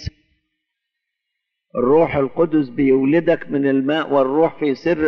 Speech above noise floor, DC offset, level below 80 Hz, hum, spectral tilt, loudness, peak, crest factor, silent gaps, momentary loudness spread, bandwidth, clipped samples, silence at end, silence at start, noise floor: 62 dB; under 0.1%; -48 dBFS; none; -8.5 dB/octave; -17 LUFS; -4 dBFS; 14 dB; none; 5 LU; 6.4 kHz; under 0.1%; 0 s; 0 s; -79 dBFS